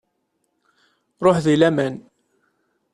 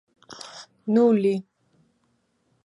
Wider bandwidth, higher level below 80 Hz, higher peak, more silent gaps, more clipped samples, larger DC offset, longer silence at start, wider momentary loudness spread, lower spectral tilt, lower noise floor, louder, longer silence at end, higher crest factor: about the same, 11.5 kHz vs 11 kHz; first, -58 dBFS vs -78 dBFS; first, -2 dBFS vs -8 dBFS; neither; neither; neither; first, 1.2 s vs 0.3 s; second, 11 LU vs 22 LU; about the same, -6.5 dB/octave vs -7 dB/octave; about the same, -72 dBFS vs -69 dBFS; first, -18 LUFS vs -22 LUFS; second, 0.95 s vs 1.25 s; about the same, 20 dB vs 18 dB